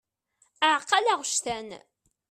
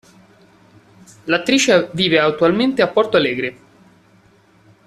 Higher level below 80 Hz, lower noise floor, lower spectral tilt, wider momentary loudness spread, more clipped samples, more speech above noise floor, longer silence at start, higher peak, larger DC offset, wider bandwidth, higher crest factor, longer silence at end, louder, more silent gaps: second, -68 dBFS vs -56 dBFS; first, -69 dBFS vs -52 dBFS; second, 0 dB/octave vs -4 dB/octave; first, 13 LU vs 9 LU; neither; first, 43 dB vs 36 dB; second, 0.6 s vs 1.25 s; second, -8 dBFS vs -2 dBFS; neither; about the same, 14 kHz vs 13.5 kHz; about the same, 20 dB vs 16 dB; second, 0.5 s vs 1.35 s; second, -25 LUFS vs -16 LUFS; neither